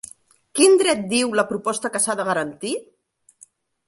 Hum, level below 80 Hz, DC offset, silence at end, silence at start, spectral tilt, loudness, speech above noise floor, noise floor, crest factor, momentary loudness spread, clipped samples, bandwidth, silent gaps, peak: none; -66 dBFS; under 0.1%; 1.05 s; 0.55 s; -2.5 dB/octave; -20 LUFS; 34 dB; -54 dBFS; 18 dB; 14 LU; under 0.1%; 11.5 kHz; none; -4 dBFS